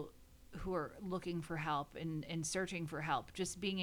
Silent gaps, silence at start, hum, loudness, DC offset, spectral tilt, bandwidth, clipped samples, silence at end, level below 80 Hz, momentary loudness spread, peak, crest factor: none; 0 s; none; -41 LUFS; under 0.1%; -4.5 dB/octave; 20 kHz; under 0.1%; 0 s; -60 dBFS; 5 LU; -24 dBFS; 18 dB